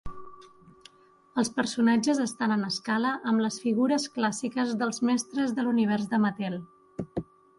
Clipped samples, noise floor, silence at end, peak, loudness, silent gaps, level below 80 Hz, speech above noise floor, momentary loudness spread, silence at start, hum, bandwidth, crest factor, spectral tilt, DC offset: under 0.1%; -59 dBFS; 0.35 s; -12 dBFS; -27 LUFS; none; -58 dBFS; 32 dB; 12 LU; 0.05 s; none; 11.5 kHz; 16 dB; -4.5 dB/octave; under 0.1%